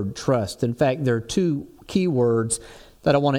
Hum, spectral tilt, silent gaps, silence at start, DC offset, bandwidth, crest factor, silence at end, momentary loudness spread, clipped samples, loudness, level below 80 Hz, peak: none; -6 dB/octave; none; 0 s; under 0.1%; 16 kHz; 16 dB; 0 s; 6 LU; under 0.1%; -23 LUFS; -50 dBFS; -6 dBFS